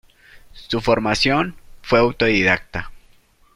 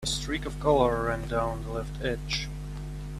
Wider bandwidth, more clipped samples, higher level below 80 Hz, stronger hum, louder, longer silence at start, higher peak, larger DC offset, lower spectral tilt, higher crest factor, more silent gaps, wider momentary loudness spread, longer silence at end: about the same, 14.5 kHz vs 14 kHz; neither; about the same, -42 dBFS vs -38 dBFS; second, none vs 50 Hz at -35 dBFS; first, -18 LUFS vs -29 LUFS; first, 0.35 s vs 0 s; first, -2 dBFS vs -8 dBFS; neither; about the same, -5 dB/octave vs -4.5 dB/octave; about the same, 18 dB vs 20 dB; neither; about the same, 14 LU vs 14 LU; first, 0.55 s vs 0 s